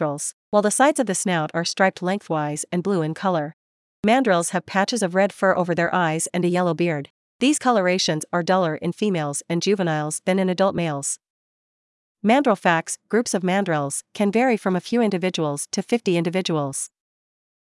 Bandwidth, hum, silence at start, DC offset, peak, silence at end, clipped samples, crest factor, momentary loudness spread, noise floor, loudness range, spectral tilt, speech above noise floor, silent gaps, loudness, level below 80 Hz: 12 kHz; none; 0 s; under 0.1%; -4 dBFS; 0.85 s; under 0.1%; 18 dB; 7 LU; under -90 dBFS; 2 LU; -4.5 dB/octave; over 69 dB; 0.33-0.52 s, 3.53-4.03 s, 7.10-7.39 s, 11.30-12.15 s; -22 LUFS; -70 dBFS